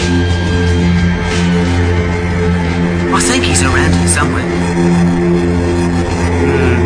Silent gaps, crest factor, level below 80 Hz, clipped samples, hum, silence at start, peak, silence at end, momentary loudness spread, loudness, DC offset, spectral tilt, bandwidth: none; 12 dB; -24 dBFS; under 0.1%; none; 0 s; 0 dBFS; 0 s; 4 LU; -12 LUFS; under 0.1%; -5.5 dB/octave; 10.5 kHz